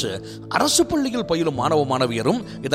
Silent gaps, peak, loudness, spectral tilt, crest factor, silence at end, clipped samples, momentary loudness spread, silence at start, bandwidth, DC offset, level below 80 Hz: none; -2 dBFS; -21 LUFS; -4 dB/octave; 18 dB; 0 s; under 0.1%; 8 LU; 0 s; 16.5 kHz; under 0.1%; -50 dBFS